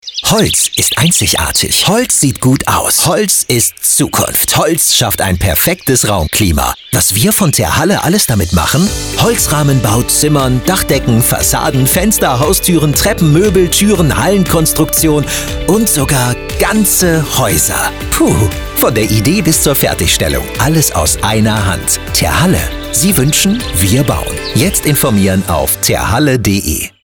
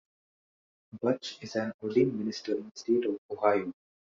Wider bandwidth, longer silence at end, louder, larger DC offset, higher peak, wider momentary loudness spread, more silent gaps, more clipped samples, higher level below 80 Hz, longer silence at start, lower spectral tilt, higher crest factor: first, over 20 kHz vs 7.6 kHz; second, 0.15 s vs 0.45 s; first, -10 LUFS vs -31 LUFS; first, 0.3% vs under 0.1%; first, 0 dBFS vs -10 dBFS; second, 4 LU vs 7 LU; second, none vs 1.74-1.79 s, 2.71-2.75 s, 3.18-3.29 s; neither; first, -26 dBFS vs -74 dBFS; second, 0.05 s vs 0.95 s; second, -3.5 dB/octave vs -5 dB/octave; second, 10 dB vs 22 dB